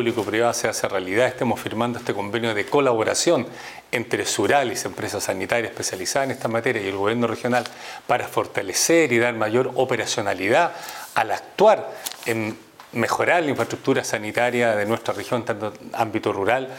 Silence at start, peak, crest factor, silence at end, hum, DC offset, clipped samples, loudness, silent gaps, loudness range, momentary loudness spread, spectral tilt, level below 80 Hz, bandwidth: 0 s; -2 dBFS; 22 dB; 0 s; none; under 0.1%; under 0.1%; -22 LUFS; none; 3 LU; 8 LU; -3.5 dB/octave; -64 dBFS; 18 kHz